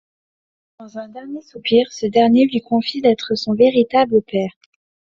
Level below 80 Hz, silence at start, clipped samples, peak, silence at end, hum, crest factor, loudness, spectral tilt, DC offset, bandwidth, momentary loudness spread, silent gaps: -60 dBFS; 0.8 s; under 0.1%; -2 dBFS; 0.7 s; none; 16 dB; -16 LUFS; -4 dB/octave; under 0.1%; 7.4 kHz; 19 LU; none